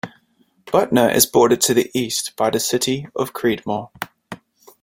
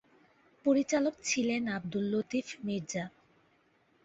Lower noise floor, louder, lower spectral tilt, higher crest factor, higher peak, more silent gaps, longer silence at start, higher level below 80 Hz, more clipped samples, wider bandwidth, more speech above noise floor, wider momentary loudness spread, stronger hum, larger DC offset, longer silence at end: second, -60 dBFS vs -69 dBFS; first, -18 LUFS vs -32 LUFS; about the same, -3.5 dB/octave vs -4.5 dB/octave; about the same, 20 dB vs 18 dB; first, 0 dBFS vs -16 dBFS; neither; second, 0.05 s vs 0.65 s; first, -56 dBFS vs -72 dBFS; neither; first, 16.5 kHz vs 8 kHz; first, 42 dB vs 38 dB; first, 19 LU vs 9 LU; neither; neither; second, 0.45 s vs 0.95 s